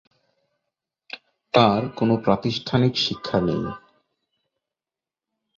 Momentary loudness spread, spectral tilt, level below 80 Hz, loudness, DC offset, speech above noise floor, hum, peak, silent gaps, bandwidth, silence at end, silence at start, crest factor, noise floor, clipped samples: 21 LU; -6.5 dB/octave; -54 dBFS; -22 LUFS; under 0.1%; over 69 dB; none; -2 dBFS; none; 7.4 kHz; 1.8 s; 1.15 s; 22 dB; under -90 dBFS; under 0.1%